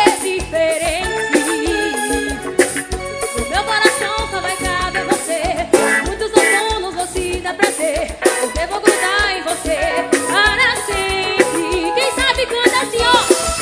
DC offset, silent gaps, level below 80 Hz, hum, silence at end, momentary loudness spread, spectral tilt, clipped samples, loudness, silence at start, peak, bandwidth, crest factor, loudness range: under 0.1%; none; -34 dBFS; none; 0 s; 7 LU; -2.5 dB/octave; under 0.1%; -16 LUFS; 0 s; 0 dBFS; 11 kHz; 16 dB; 3 LU